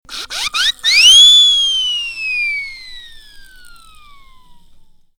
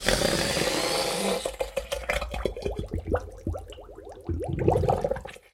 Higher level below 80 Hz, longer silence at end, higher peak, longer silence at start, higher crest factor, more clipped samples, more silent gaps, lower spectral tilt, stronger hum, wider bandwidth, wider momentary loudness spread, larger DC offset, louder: about the same, -44 dBFS vs -40 dBFS; first, 1.75 s vs 0.15 s; first, 0 dBFS vs -6 dBFS; about the same, 0.1 s vs 0 s; second, 14 dB vs 22 dB; neither; neither; second, 4 dB/octave vs -4 dB/octave; neither; first, over 20 kHz vs 16.5 kHz; first, 20 LU vs 12 LU; neither; first, -8 LUFS vs -28 LUFS